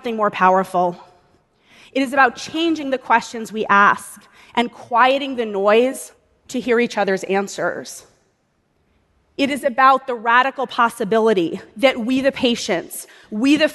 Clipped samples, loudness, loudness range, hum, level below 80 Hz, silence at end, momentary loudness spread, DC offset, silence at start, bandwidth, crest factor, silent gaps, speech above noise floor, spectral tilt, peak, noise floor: under 0.1%; -18 LUFS; 4 LU; none; -60 dBFS; 0 s; 14 LU; under 0.1%; 0.05 s; 12 kHz; 18 dB; none; 47 dB; -4 dB/octave; 0 dBFS; -65 dBFS